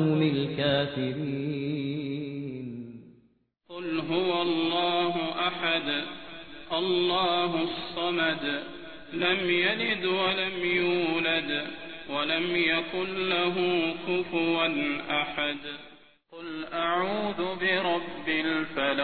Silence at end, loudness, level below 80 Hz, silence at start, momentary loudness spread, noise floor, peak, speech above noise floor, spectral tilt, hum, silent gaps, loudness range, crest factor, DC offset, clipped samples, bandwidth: 0 s; -27 LUFS; -62 dBFS; 0 s; 13 LU; -66 dBFS; -10 dBFS; 38 dB; -8 dB/octave; none; none; 4 LU; 18 dB; 0.3%; under 0.1%; 4.6 kHz